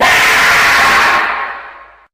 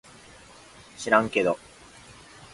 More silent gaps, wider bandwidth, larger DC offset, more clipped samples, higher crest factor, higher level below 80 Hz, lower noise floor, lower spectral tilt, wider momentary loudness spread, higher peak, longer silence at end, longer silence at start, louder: neither; first, 16 kHz vs 11.5 kHz; neither; neither; second, 10 dB vs 26 dB; first, -40 dBFS vs -60 dBFS; second, -35 dBFS vs -50 dBFS; second, -0.5 dB/octave vs -4.5 dB/octave; second, 14 LU vs 26 LU; about the same, 0 dBFS vs -2 dBFS; second, 0.35 s vs 1 s; second, 0 s vs 1 s; first, -8 LUFS vs -24 LUFS